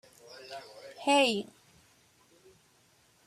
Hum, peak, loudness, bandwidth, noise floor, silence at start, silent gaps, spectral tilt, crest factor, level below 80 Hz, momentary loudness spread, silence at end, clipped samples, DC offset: none; -12 dBFS; -28 LUFS; 14 kHz; -66 dBFS; 0.3 s; none; -2.5 dB/octave; 22 dB; -80 dBFS; 24 LU; 1.85 s; under 0.1%; under 0.1%